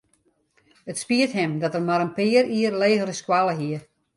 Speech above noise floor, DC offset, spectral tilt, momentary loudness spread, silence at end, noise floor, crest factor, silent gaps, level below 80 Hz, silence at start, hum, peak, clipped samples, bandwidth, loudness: 44 dB; under 0.1%; -5 dB/octave; 12 LU; 0.35 s; -66 dBFS; 18 dB; none; -68 dBFS; 0.85 s; none; -6 dBFS; under 0.1%; 11.5 kHz; -22 LUFS